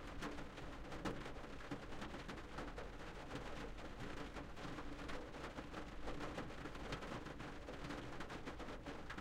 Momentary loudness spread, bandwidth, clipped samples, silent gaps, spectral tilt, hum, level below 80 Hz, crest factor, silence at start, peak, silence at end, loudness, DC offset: 4 LU; 15.5 kHz; under 0.1%; none; -5 dB/octave; none; -56 dBFS; 16 dB; 0 s; -32 dBFS; 0 s; -51 LUFS; under 0.1%